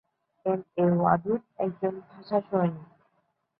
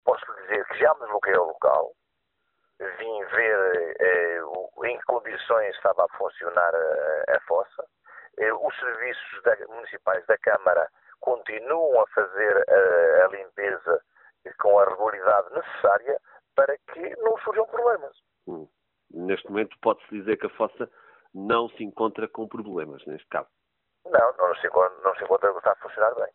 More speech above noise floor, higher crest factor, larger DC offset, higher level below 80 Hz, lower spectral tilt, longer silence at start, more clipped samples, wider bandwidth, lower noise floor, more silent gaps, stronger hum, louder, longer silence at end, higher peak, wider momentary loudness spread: second, 47 dB vs 53 dB; about the same, 22 dB vs 20 dB; neither; about the same, -66 dBFS vs -70 dBFS; first, -12.5 dB/octave vs -2 dB/octave; first, 0.45 s vs 0.05 s; neither; first, 5 kHz vs 4 kHz; about the same, -74 dBFS vs -77 dBFS; neither; neither; second, -28 LUFS vs -24 LUFS; first, 0.75 s vs 0.05 s; second, -8 dBFS vs -4 dBFS; second, 10 LU vs 13 LU